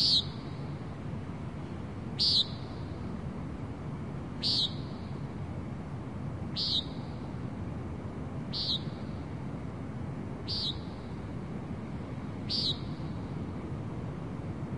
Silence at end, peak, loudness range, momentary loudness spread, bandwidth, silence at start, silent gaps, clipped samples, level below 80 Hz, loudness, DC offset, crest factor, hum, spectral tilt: 0 s; -14 dBFS; 5 LU; 12 LU; 11 kHz; 0 s; none; under 0.1%; -52 dBFS; -34 LUFS; 0.2%; 20 dB; none; -5.5 dB/octave